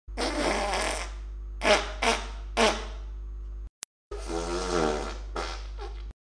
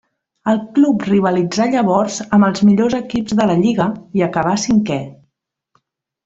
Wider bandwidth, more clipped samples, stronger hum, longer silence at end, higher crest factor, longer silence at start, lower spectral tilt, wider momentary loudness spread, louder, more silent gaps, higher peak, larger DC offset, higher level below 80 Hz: first, 10.5 kHz vs 8 kHz; neither; first, 50 Hz at -40 dBFS vs none; second, 0.1 s vs 1.1 s; first, 22 dB vs 14 dB; second, 0.1 s vs 0.45 s; second, -3 dB/octave vs -6 dB/octave; first, 17 LU vs 6 LU; second, -28 LUFS vs -16 LUFS; first, 3.69-4.11 s vs none; second, -8 dBFS vs -2 dBFS; neither; first, -38 dBFS vs -52 dBFS